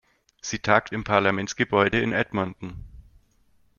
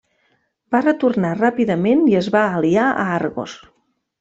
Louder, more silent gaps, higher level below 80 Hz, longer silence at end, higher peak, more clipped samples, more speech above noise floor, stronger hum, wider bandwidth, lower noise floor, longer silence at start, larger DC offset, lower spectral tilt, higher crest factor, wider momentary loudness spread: second, -24 LUFS vs -17 LUFS; neither; first, -50 dBFS vs -60 dBFS; about the same, 0.75 s vs 0.65 s; about the same, -2 dBFS vs -2 dBFS; neither; second, 41 dB vs 48 dB; neither; second, 7.2 kHz vs 8 kHz; about the same, -64 dBFS vs -65 dBFS; second, 0.45 s vs 0.7 s; neither; second, -4.5 dB/octave vs -7 dB/octave; first, 24 dB vs 16 dB; first, 17 LU vs 7 LU